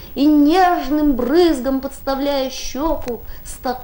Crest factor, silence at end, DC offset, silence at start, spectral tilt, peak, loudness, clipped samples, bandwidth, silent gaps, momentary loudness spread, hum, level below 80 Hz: 14 dB; 0 s; under 0.1%; 0 s; -4.5 dB/octave; -4 dBFS; -17 LUFS; under 0.1%; 17 kHz; none; 13 LU; none; -32 dBFS